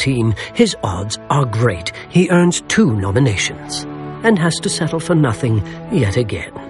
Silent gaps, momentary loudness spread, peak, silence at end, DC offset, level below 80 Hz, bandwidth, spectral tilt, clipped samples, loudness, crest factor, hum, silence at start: none; 9 LU; 0 dBFS; 0 s; under 0.1%; -42 dBFS; 11.5 kHz; -5.5 dB/octave; under 0.1%; -17 LUFS; 16 dB; none; 0 s